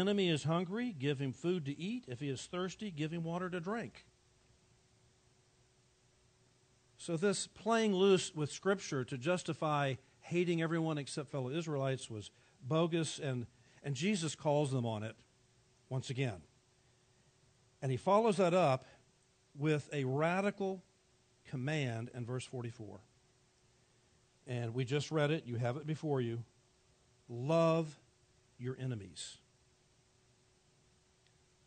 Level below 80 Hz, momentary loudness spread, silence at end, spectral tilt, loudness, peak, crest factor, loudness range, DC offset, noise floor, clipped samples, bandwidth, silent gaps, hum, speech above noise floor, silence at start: -76 dBFS; 16 LU; 2.3 s; -5.5 dB/octave; -37 LUFS; -18 dBFS; 20 dB; 9 LU; under 0.1%; -71 dBFS; under 0.1%; 9 kHz; none; none; 35 dB; 0 s